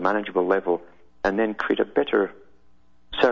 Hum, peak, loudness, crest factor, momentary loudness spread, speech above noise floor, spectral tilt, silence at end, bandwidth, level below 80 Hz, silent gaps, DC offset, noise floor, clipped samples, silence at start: none; -4 dBFS; -24 LUFS; 20 dB; 6 LU; 38 dB; -6 dB/octave; 0 s; 7.2 kHz; -52 dBFS; none; 0.3%; -61 dBFS; under 0.1%; 0 s